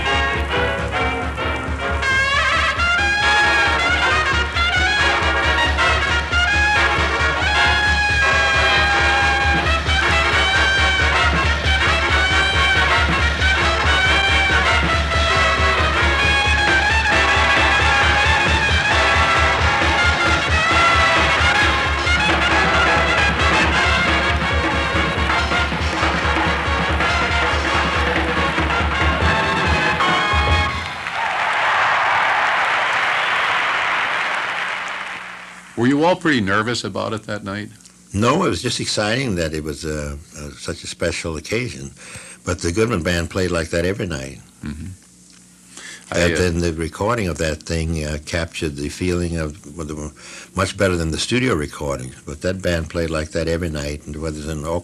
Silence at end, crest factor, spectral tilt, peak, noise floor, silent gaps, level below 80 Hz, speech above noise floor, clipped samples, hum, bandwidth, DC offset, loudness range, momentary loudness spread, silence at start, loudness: 0 s; 14 dB; -4 dB/octave; -4 dBFS; -47 dBFS; none; -28 dBFS; 25 dB; under 0.1%; none; 12.5 kHz; under 0.1%; 9 LU; 13 LU; 0 s; -17 LUFS